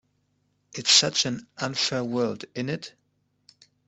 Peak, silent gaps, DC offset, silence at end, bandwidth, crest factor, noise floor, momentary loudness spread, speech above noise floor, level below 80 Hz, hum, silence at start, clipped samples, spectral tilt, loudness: -4 dBFS; none; under 0.1%; 1 s; 8.6 kHz; 24 dB; -71 dBFS; 16 LU; 45 dB; -68 dBFS; 50 Hz at -60 dBFS; 0.75 s; under 0.1%; -2 dB/octave; -24 LUFS